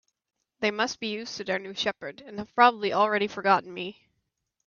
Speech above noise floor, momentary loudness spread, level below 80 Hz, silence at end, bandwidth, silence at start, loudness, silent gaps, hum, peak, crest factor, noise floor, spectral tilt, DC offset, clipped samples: 52 dB; 16 LU; -70 dBFS; 0.75 s; 7.2 kHz; 0.6 s; -26 LUFS; none; none; -6 dBFS; 22 dB; -79 dBFS; -3.5 dB/octave; under 0.1%; under 0.1%